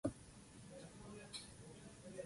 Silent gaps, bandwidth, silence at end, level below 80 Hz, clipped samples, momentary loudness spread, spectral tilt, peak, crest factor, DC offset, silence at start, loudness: none; 11.5 kHz; 0 s; -68 dBFS; under 0.1%; 8 LU; -4.5 dB/octave; -28 dBFS; 24 dB; under 0.1%; 0.05 s; -54 LUFS